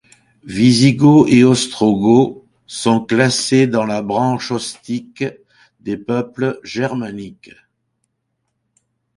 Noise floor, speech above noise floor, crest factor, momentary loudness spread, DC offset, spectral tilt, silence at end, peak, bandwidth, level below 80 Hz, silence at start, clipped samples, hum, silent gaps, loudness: -72 dBFS; 57 dB; 16 dB; 16 LU; under 0.1%; -5.5 dB/octave; 1.85 s; 0 dBFS; 11.5 kHz; -52 dBFS; 0.45 s; under 0.1%; none; none; -15 LUFS